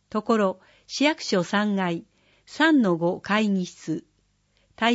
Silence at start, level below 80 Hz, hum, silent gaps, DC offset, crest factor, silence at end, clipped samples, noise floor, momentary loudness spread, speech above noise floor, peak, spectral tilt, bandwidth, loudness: 0.15 s; -68 dBFS; 50 Hz at -45 dBFS; none; under 0.1%; 18 dB; 0 s; under 0.1%; -67 dBFS; 14 LU; 43 dB; -6 dBFS; -5 dB/octave; 8 kHz; -24 LUFS